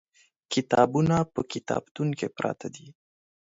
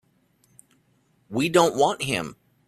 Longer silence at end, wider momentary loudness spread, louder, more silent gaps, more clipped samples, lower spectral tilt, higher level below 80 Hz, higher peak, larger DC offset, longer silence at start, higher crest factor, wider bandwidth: first, 0.65 s vs 0.35 s; about the same, 13 LU vs 12 LU; second, -27 LUFS vs -23 LUFS; first, 1.91-1.95 s vs none; neither; first, -6 dB/octave vs -4.5 dB/octave; about the same, -58 dBFS vs -62 dBFS; about the same, -6 dBFS vs -4 dBFS; neither; second, 0.5 s vs 1.3 s; about the same, 22 dB vs 22 dB; second, 8 kHz vs 14.5 kHz